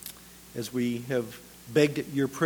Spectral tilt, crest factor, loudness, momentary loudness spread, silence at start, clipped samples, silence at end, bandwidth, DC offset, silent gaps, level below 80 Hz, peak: -5.5 dB/octave; 20 dB; -29 LUFS; 17 LU; 0 s; under 0.1%; 0 s; over 20 kHz; under 0.1%; none; -62 dBFS; -8 dBFS